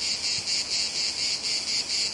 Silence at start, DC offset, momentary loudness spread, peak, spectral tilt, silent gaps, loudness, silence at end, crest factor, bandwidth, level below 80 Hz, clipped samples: 0 s; under 0.1%; 1 LU; -14 dBFS; 1 dB/octave; none; -25 LUFS; 0 s; 14 dB; 11.5 kHz; -62 dBFS; under 0.1%